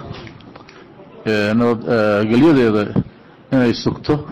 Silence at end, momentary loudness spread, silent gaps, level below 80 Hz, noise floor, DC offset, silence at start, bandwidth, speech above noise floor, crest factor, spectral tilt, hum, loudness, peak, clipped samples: 0 s; 18 LU; none; -46 dBFS; -41 dBFS; under 0.1%; 0 s; 9.6 kHz; 26 dB; 10 dB; -7.5 dB/octave; none; -16 LUFS; -6 dBFS; under 0.1%